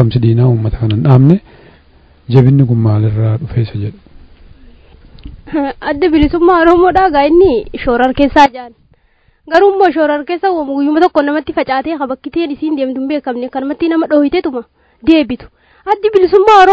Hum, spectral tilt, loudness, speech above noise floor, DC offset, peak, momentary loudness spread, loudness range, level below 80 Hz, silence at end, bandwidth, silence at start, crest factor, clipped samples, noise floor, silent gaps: none; -8.5 dB/octave; -11 LUFS; 42 dB; under 0.1%; 0 dBFS; 11 LU; 5 LU; -34 dBFS; 0 s; 8 kHz; 0 s; 12 dB; 1%; -53 dBFS; none